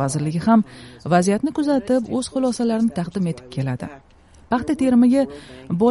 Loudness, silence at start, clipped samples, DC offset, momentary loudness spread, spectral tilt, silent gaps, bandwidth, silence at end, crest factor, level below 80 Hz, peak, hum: -20 LUFS; 0 s; under 0.1%; under 0.1%; 11 LU; -6.5 dB/octave; none; 11.5 kHz; 0 s; 16 dB; -50 dBFS; -4 dBFS; none